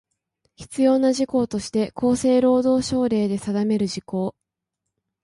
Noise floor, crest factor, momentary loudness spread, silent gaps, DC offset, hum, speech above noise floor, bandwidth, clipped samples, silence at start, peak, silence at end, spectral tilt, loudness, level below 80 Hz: -82 dBFS; 14 dB; 9 LU; none; under 0.1%; none; 62 dB; 11.5 kHz; under 0.1%; 0.6 s; -8 dBFS; 0.95 s; -6 dB/octave; -21 LUFS; -54 dBFS